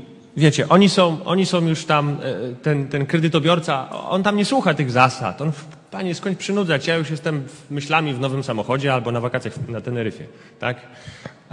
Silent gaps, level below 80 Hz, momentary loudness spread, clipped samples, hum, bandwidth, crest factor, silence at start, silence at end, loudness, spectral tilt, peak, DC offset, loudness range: none; -60 dBFS; 12 LU; under 0.1%; none; 11 kHz; 20 dB; 0 s; 0.2 s; -20 LUFS; -5.5 dB/octave; 0 dBFS; under 0.1%; 5 LU